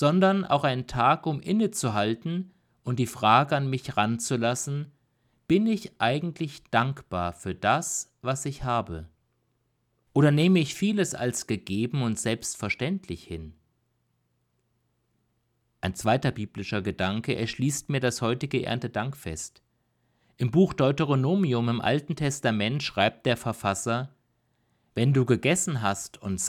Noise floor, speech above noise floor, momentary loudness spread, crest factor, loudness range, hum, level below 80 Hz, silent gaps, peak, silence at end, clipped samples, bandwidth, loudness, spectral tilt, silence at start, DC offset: -73 dBFS; 47 dB; 11 LU; 22 dB; 6 LU; none; -56 dBFS; none; -6 dBFS; 0 s; under 0.1%; 15.5 kHz; -26 LUFS; -5 dB/octave; 0 s; under 0.1%